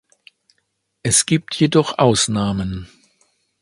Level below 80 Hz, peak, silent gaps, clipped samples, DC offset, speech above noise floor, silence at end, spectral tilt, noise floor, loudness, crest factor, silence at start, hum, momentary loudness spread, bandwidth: -44 dBFS; 0 dBFS; none; under 0.1%; under 0.1%; 53 dB; 0.75 s; -4 dB/octave; -70 dBFS; -17 LUFS; 20 dB; 1.05 s; none; 12 LU; 11.5 kHz